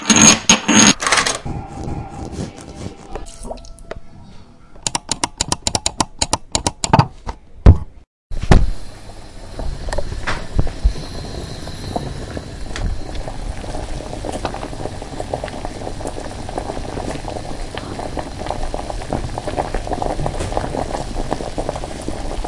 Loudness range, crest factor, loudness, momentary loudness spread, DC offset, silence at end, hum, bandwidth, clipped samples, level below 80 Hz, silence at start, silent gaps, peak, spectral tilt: 10 LU; 20 dB; -20 LUFS; 19 LU; under 0.1%; 0 s; none; 12 kHz; under 0.1%; -26 dBFS; 0 s; 8.07-8.30 s; 0 dBFS; -3 dB/octave